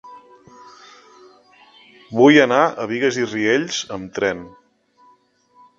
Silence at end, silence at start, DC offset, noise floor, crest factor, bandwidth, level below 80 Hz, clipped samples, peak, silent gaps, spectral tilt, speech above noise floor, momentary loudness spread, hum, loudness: 1.3 s; 0.05 s; under 0.1%; -56 dBFS; 20 dB; 7.6 kHz; -62 dBFS; under 0.1%; 0 dBFS; none; -4.5 dB/octave; 39 dB; 14 LU; none; -17 LUFS